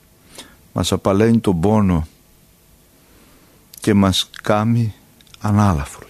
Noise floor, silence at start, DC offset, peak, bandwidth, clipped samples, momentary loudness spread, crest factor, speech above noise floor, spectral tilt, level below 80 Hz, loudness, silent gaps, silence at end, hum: -51 dBFS; 0.4 s; under 0.1%; 0 dBFS; 14.5 kHz; under 0.1%; 14 LU; 18 dB; 35 dB; -6 dB/octave; -38 dBFS; -17 LUFS; none; 0.1 s; none